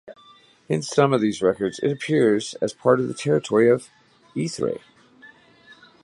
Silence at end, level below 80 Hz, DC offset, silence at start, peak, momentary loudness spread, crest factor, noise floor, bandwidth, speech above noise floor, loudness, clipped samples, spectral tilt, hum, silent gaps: 0.3 s; -62 dBFS; under 0.1%; 0.05 s; -4 dBFS; 10 LU; 20 dB; -53 dBFS; 11.5 kHz; 32 dB; -22 LUFS; under 0.1%; -6 dB/octave; none; none